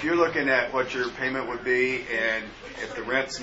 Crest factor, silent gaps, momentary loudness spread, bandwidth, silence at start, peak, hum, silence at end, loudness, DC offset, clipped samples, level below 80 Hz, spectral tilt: 18 dB; none; 11 LU; 8 kHz; 0 s; -8 dBFS; none; 0 s; -26 LUFS; under 0.1%; under 0.1%; -54 dBFS; -4 dB/octave